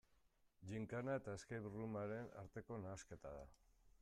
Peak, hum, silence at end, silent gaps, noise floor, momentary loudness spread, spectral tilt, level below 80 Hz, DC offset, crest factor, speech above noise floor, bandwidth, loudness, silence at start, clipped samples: -34 dBFS; none; 0.15 s; none; -78 dBFS; 11 LU; -6.5 dB/octave; -72 dBFS; under 0.1%; 16 dB; 28 dB; 13.5 kHz; -51 LUFS; 0.6 s; under 0.1%